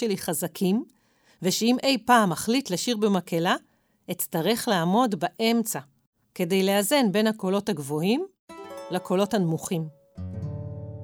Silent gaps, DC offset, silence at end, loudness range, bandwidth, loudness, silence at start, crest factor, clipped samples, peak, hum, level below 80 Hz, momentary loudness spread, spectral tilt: 6.07-6.13 s, 8.39-8.48 s; under 0.1%; 0 s; 3 LU; over 20 kHz; -25 LUFS; 0 s; 18 dB; under 0.1%; -6 dBFS; none; -64 dBFS; 15 LU; -4.5 dB/octave